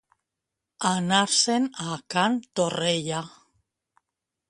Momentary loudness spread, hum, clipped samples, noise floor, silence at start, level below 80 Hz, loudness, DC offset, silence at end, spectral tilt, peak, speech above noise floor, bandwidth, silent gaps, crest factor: 11 LU; none; under 0.1%; -85 dBFS; 0.8 s; -68 dBFS; -24 LUFS; under 0.1%; 1.2 s; -3 dB/octave; -6 dBFS; 61 dB; 11.5 kHz; none; 20 dB